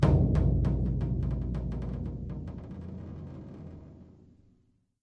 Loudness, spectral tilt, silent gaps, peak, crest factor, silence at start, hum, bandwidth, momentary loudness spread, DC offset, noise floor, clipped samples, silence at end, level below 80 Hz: -31 LUFS; -10 dB/octave; none; -10 dBFS; 20 dB; 0 s; none; 6.4 kHz; 20 LU; under 0.1%; -68 dBFS; under 0.1%; 0.95 s; -36 dBFS